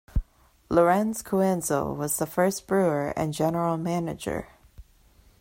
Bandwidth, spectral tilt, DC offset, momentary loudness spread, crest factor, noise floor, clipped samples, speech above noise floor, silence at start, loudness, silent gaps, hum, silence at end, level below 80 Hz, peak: 16.5 kHz; -5.5 dB/octave; under 0.1%; 10 LU; 18 dB; -58 dBFS; under 0.1%; 33 dB; 0.15 s; -26 LUFS; none; none; 0.6 s; -42 dBFS; -8 dBFS